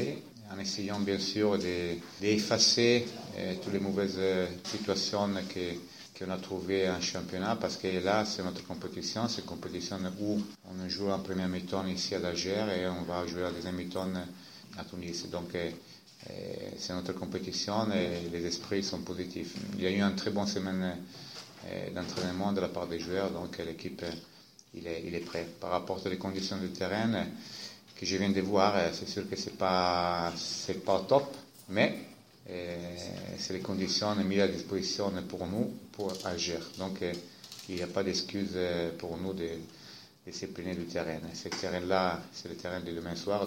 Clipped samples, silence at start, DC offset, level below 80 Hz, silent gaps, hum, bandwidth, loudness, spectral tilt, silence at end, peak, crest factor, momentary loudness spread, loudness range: under 0.1%; 0 s; under 0.1%; -64 dBFS; none; none; 16.5 kHz; -33 LUFS; -4.5 dB/octave; 0 s; -10 dBFS; 24 dB; 13 LU; 8 LU